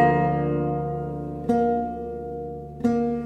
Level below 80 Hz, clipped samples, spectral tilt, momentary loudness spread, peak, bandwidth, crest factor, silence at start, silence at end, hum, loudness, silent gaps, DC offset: -46 dBFS; under 0.1%; -9.5 dB/octave; 10 LU; -8 dBFS; 9 kHz; 16 dB; 0 s; 0 s; none; -26 LUFS; none; under 0.1%